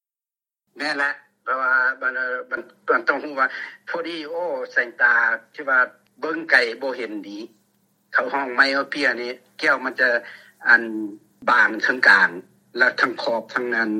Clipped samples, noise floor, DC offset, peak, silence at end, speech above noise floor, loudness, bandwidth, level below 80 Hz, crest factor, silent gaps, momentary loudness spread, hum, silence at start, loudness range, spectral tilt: under 0.1%; under -90 dBFS; under 0.1%; 0 dBFS; 0 s; over 69 dB; -20 LUFS; 13 kHz; -82 dBFS; 22 dB; none; 14 LU; none; 0.75 s; 5 LU; -3 dB/octave